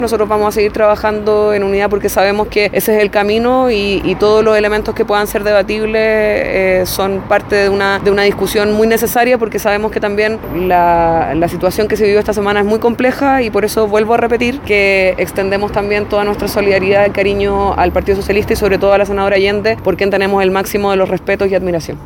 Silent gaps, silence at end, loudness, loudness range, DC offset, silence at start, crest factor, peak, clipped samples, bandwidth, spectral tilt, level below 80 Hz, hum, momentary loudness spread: none; 0 s; -12 LUFS; 1 LU; under 0.1%; 0 s; 12 dB; 0 dBFS; under 0.1%; 17 kHz; -5 dB/octave; -32 dBFS; none; 4 LU